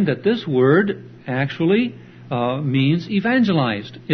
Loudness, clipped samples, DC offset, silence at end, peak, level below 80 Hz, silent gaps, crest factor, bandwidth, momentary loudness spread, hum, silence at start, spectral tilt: -19 LUFS; under 0.1%; under 0.1%; 0 s; -4 dBFS; -60 dBFS; none; 14 dB; 6.4 kHz; 11 LU; none; 0 s; -8.5 dB/octave